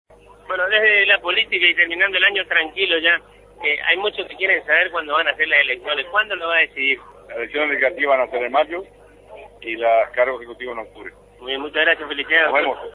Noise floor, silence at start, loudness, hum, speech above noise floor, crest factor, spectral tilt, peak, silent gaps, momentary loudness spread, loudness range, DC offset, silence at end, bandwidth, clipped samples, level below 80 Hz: -42 dBFS; 0.5 s; -17 LUFS; 50 Hz at -55 dBFS; 23 dB; 20 dB; -3.5 dB/octave; 0 dBFS; none; 15 LU; 6 LU; under 0.1%; 0.05 s; 10.5 kHz; under 0.1%; -56 dBFS